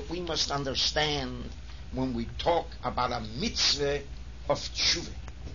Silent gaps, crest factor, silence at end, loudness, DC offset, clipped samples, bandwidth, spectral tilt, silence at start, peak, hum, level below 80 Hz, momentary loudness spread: none; 18 dB; 0 s; -29 LUFS; 0.5%; under 0.1%; 7.4 kHz; -3 dB/octave; 0 s; -14 dBFS; none; -42 dBFS; 16 LU